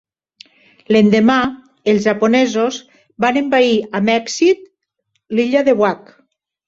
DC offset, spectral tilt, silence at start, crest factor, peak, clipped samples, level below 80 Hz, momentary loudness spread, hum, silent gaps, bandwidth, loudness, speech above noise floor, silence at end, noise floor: under 0.1%; -5 dB/octave; 0.9 s; 16 dB; 0 dBFS; under 0.1%; -56 dBFS; 9 LU; none; none; 7.8 kHz; -15 LUFS; 55 dB; 0.7 s; -69 dBFS